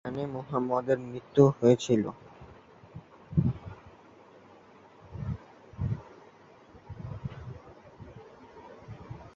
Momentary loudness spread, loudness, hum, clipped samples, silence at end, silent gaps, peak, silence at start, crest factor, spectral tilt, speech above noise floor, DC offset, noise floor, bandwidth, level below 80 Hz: 27 LU; -29 LUFS; none; under 0.1%; 0.05 s; none; -6 dBFS; 0.05 s; 26 dB; -7.5 dB/octave; 29 dB; under 0.1%; -55 dBFS; 7.8 kHz; -52 dBFS